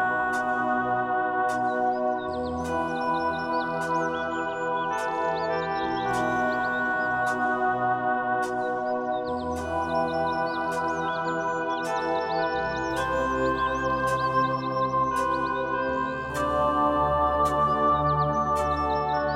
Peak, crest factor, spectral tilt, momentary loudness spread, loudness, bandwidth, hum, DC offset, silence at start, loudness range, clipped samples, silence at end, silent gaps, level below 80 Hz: -12 dBFS; 14 dB; -5.5 dB/octave; 5 LU; -26 LUFS; 15.5 kHz; none; under 0.1%; 0 s; 3 LU; under 0.1%; 0 s; none; -48 dBFS